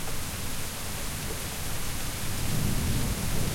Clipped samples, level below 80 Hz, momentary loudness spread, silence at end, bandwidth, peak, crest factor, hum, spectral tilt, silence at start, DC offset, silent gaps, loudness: under 0.1%; -36 dBFS; 5 LU; 0 s; 16.5 kHz; -14 dBFS; 14 dB; none; -3.5 dB/octave; 0 s; under 0.1%; none; -32 LUFS